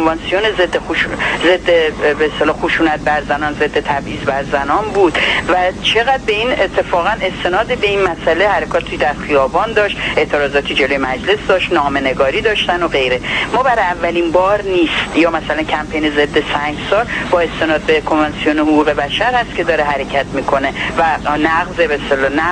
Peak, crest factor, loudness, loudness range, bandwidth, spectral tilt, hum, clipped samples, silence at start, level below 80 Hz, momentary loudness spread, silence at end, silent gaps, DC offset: 0 dBFS; 14 dB; -14 LUFS; 1 LU; 10.5 kHz; -4.5 dB/octave; none; under 0.1%; 0 s; -34 dBFS; 4 LU; 0 s; none; under 0.1%